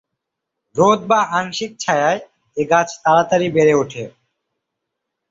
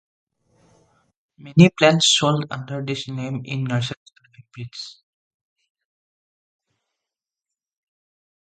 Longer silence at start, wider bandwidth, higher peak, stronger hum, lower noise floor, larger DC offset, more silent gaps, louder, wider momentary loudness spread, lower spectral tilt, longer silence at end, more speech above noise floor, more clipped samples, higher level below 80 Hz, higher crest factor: second, 0.75 s vs 1.45 s; second, 7.8 kHz vs 9.2 kHz; about the same, -2 dBFS vs 0 dBFS; neither; second, -80 dBFS vs -88 dBFS; neither; second, none vs 3.97-4.06 s; about the same, -17 LUFS vs -19 LUFS; second, 13 LU vs 22 LU; about the same, -4.5 dB/octave vs -4.5 dB/octave; second, 1.2 s vs 3.55 s; second, 64 dB vs 68 dB; neither; about the same, -60 dBFS vs -60 dBFS; second, 16 dB vs 24 dB